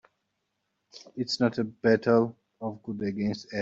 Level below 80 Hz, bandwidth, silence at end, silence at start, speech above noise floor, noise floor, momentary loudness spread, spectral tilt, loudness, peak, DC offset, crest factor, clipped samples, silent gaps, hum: -66 dBFS; 8 kHz; 0 s; 0.95 s; 53 dB; -80 dBFS; 14 LU; -6 dB/octave; -28 LUFS; -10 dBFS; under 0.1%; 20 dB; under 0.1%; none; none